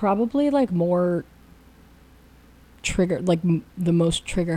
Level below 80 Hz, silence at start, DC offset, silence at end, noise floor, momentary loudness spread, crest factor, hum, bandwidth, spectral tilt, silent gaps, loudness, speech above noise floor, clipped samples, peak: -44 dBFS; 0 s; under 0.1%; 0 s; -51 dBFS; 5 LU; 14 dB; none; 11.5 kHz; -6.5 dB/octave; none; -23 LUFS; 29 dB; under 0.1%; -10 dBFS